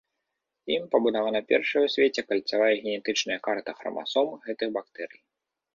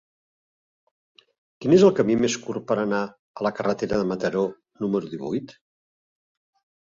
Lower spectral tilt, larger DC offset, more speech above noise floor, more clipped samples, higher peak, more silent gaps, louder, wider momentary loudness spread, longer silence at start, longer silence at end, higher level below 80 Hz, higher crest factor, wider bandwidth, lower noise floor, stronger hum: second, -3 dB/octave vs -6 dB/octave; neither; second, 57 dB vs over 68 dB; neither; second, -8 dBFS vs -4 dBFS; second, none vs 3.19-3.34 s; about the same, -26 LUFS vs -24 LUFS; second, 11 LU vs 14 LU; second, 0.65 s vs 1.6 s; second, 0.7 s vs 1.35 s; second, -72 dBFS vs -58 dBFS; about the same, 20 dB vs 20 dB; about the same, 7.4 kHz vs 7.8 kHz; second, -83 dBFS vs under -90 dBFS; neither